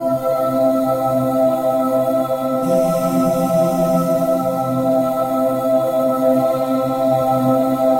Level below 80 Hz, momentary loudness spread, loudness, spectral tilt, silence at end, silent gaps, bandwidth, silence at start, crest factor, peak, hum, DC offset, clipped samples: -50 dBFS; 3 LU; -17 LUFS; -7.5 dB/octave; 0 s; none; 16 kHz; 0 s; 12 dB; -6 dBFS; none; under 0.1%; under 0.1%